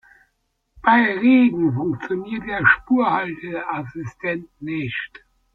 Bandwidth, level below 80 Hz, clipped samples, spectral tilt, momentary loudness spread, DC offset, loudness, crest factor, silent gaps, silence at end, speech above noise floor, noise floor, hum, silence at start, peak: 4.7 kHz; -54 dBFS; under 0.1%; -8 dB/octave; 13 LU; under 0.1%; -20 LUFS; 20 dB; none; 0.5 s; 51 dB; -71 dBFS; none; 0.8 s; -2 dBFS